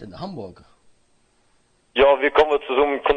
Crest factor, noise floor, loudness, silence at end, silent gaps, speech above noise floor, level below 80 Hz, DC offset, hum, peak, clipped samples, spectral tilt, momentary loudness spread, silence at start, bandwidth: 20 dB; -63 dBFS; -18 LUFS; 0 s; none; 43 dB; -48 dBFS; under 0.1%; none; -2 dBFS; under 0.1%; -5.5 dB/octave; 19 LU; 0 s; 7.2 kHz